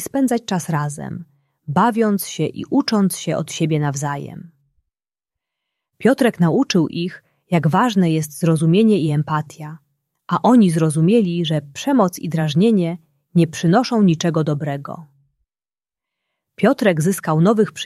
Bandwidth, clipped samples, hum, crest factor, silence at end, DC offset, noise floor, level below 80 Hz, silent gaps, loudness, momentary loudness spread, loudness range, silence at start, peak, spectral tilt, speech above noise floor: 14 kHz; under 0.1%; none; 16 dB; 0 s; under 0.1%; under -90 dBFS; -60 dBFS; none; -18 LUFS; 13 LU; 5 LU; 0 s; -2 dBFS; -6.5 dB/octave; over 73 dB